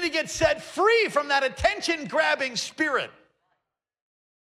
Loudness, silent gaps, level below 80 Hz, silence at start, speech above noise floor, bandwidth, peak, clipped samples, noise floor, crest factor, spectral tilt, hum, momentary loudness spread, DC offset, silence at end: -24 LUFS; none; -52 dBFS; 0 s; 56 dB; 15 kHz; -10 dBFS; under 0.1%; -81 dBFS; 16 dB; -2.5 dB/octave; none; 6 LU; under 0.1%; 1.4 s